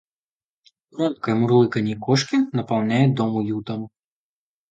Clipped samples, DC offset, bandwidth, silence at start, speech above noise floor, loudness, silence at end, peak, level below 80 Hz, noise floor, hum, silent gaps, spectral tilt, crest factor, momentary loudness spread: under 0.1%; under 0.1%; 9 kHz; 0.95 s; over 70 dB; -21 LUFS; 0.8 s; -4 dBFS; -62 dBFS; under -90 dBFS; none; none; -6.5 dB/octave; 18 dB; 13 LU